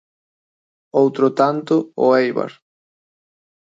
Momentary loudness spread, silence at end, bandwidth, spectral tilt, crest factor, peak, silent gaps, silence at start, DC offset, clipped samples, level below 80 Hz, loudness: 8 LU; 1.15 s; 7.8 kHz; -7 dB/octave; 18 dB; -2 dBFS; none; 0.95 s; under 0.1%; under 0.1%; -74 dBFS; -17 LUFS